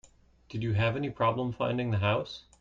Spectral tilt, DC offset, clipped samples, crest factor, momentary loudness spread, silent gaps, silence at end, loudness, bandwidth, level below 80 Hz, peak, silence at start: -7.5 dB/octave; under 0.1%; under 0.1%; 16 dB; 7 LU; none; 0.2 s; -30 LUFS; 7.6 kHz; -56 dBFS; -14 dBFS; 0.5 s